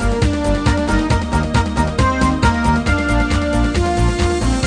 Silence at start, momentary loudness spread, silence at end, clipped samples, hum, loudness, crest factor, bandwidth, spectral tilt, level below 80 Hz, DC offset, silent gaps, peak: 0 s; 2 LU; 0 s; under 0.1%; none; -17 LUFS; 14 dB; 10 kHz; -6 dB/octave; -20 dBFS; 0.4%; none; 0 dBFS